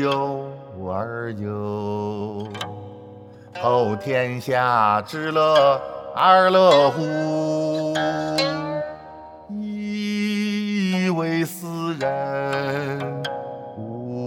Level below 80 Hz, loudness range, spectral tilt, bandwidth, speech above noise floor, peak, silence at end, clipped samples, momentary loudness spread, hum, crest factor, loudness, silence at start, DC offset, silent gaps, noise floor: -64 dBFS; 9 LU; -5.5 dB/octave; 16 kHz; 22 dB; -2 dBFS; 0 s; under 0.1%; 17 LU; none; 20 dB; -22 LUFS; 0 s; under 0.1%; none; -42 dBFS